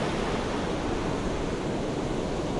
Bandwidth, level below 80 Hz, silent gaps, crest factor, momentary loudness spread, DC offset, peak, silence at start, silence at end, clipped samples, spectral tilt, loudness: 11.5 kHz; -40 dBFS; none; 12 dB; 1 LU; under 0.1%; -16 dBFS; 0 s; 0 s; under 0.1%; -5.5 dB/octave; -30 LUFS